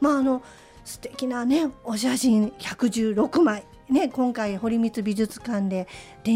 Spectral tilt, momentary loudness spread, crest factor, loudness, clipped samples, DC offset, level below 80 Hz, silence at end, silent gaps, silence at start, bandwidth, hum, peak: -5 dB/octave; 11 LU; 14 dB; -24 LUFS; under 0.1%; under 0.1%; -56 dBFS; 0 s; none; 0 s; 16 kHz; none; -10 dBFS